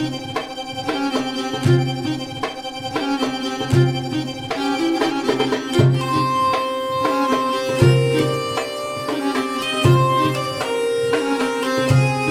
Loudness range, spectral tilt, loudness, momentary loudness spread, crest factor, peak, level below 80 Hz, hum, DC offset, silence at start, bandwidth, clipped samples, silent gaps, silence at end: 4 LU; -6 dB/octave; -20 LUFS; 9 LU; 18 dB; -2 dBFS; -48 dBFS; none; under 0.1%; 0 s; 15 kHz; under 0.1%; none; 0 s